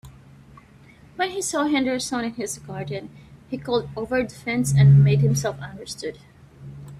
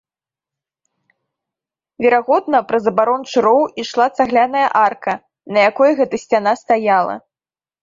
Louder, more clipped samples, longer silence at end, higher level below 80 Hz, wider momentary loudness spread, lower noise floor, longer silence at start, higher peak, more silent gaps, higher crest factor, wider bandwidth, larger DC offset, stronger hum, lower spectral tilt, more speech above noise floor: second, -22 LUFS vs -15 LUFS; neither; second, 0 s vs 0.65 s; first, -50 dBFS vs -62 dBFS; first, 20 LU vs 6 LU; second, -49 dBFS vs under -90 dBFS; second, 0.05 s vs 2 s; second, -6 dBFS vs -2 dBFS; neither; about the same, 16 dB vs 16 dB; first, 13 kHz vs 7.6 kHz; neither; neither; about the same, -6 dB/octave vs -5 dB/octave; second, 28 dB vs over 75 dB